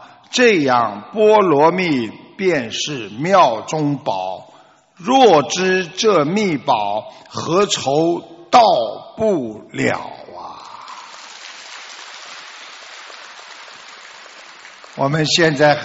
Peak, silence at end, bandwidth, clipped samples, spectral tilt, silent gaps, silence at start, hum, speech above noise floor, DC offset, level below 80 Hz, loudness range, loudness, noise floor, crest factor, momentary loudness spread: 0 dBFS; 0 s; 8 kHz; under 0.1%; -3 dB/octave; none; 0 s; none; 33 dB; under 0.1%; -60 dBFS; 18 LU; -16 LUFS; -48 dBFS; 18 dB; 22 LU